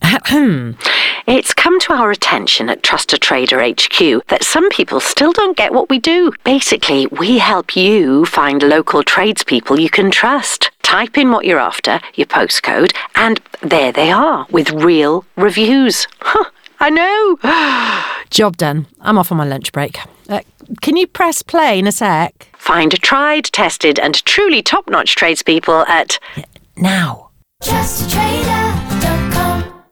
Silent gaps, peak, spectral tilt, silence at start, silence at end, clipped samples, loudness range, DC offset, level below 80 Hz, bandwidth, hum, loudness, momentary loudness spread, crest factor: none; 0 dBFS; -3.5 dB/octave; 0 s; 0.2 s; under 0.1%; 4 LU; under 0.1%; -38 dBFS; 20 kHz; none; -12 LUFS; 7 LU; 12 dB